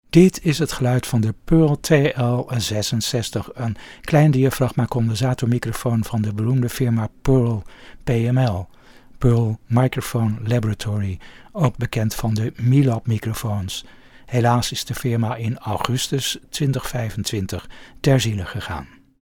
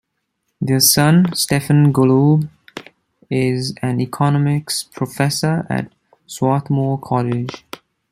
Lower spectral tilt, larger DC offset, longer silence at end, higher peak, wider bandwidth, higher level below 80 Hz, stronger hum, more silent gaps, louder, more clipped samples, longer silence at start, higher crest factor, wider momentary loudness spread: about the same, -6 dB/octave vs -5 dB/octave; neither; second, 0.35 s vs 0.55 s; about the same, 0 dBFS vs 0 dBFS; first, 18 kHz vs 15.5 kHz; first, -40 dBFS vs -54 dBFS; neither; neither; second, -21 LUFS vs -16 LUFS; neither; second, 0.15 s vs 0.6 s; about the same, 20 dB vs 18 dB; second, 11 LU vs 20 LU